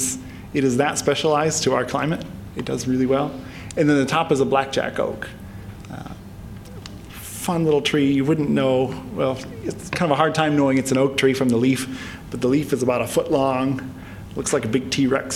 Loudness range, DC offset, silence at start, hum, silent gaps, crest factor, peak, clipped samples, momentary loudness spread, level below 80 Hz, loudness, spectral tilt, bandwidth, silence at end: 4 LU; under 0.1%; 0 s; none; none; 20 dB; -2 dBFS; under 0.1%; 17 LU; -46 dBFS; -21 LUFS; -5 dB/octave; 16.5 kHz; 0 s